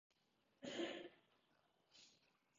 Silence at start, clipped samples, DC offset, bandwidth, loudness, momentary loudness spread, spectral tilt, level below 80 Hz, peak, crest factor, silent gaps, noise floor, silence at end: 0.6 s; under 0.1%; under 0.1%; 7.4 kHz; -51 LUFS; 19 LU; -2 dB/octave; under -90 dBFS; -34 dBFS; 22 dB; none; -83 dBFS; 0.45 s